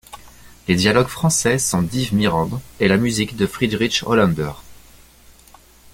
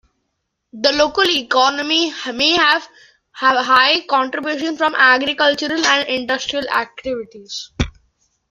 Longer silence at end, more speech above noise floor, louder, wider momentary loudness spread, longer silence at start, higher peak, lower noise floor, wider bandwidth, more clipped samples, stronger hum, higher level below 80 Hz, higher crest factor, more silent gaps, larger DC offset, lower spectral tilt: first, 1.2 s vs 0.6 s; second, 30 dB vs 56 dB; about the same, -18 LUFS vs -16 LUFS; second, 6 LU vs 13 LU; second, 0.1 s vs 0.75 s; about the same, -2 dBFS vs 0 dBFS; second, -48 dBFS vs -73 dBFS; about the same, 17 kHz vs 15.5 kHz; neither; neither; about the same, -44 dBFS vs -42 dBFS; about the same, 18 dB vs 18 dB; neither; neither; first, -4.5 dB/octave vs -2.5 dB/octave